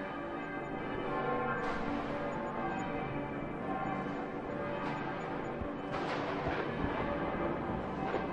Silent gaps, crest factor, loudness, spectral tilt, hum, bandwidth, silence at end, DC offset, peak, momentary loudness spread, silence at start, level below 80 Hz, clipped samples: none; 16 dB; -37 LUFS; -7 dB/octave; none; 10.5 kHz; 0 s; under 0.1%; -20 dBFS; 4 LU; 0 s; -54 dBFS; under 0.1%